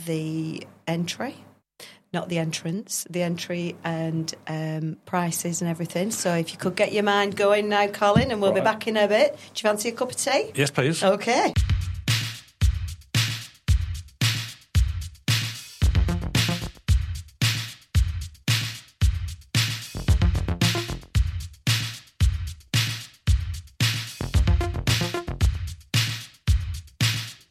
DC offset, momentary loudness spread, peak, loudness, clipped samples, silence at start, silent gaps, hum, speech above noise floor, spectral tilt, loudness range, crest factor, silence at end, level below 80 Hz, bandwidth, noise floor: under 0.1%; 9 LU; -6 dBFS; -25 LUFS; under 0.1%; 0 s; none; none; 25 dB; -4.5 dB/octave; 6 LU; 18 dB; 0.15 s; -32 dBFS; 16 kHz; -49 dBFS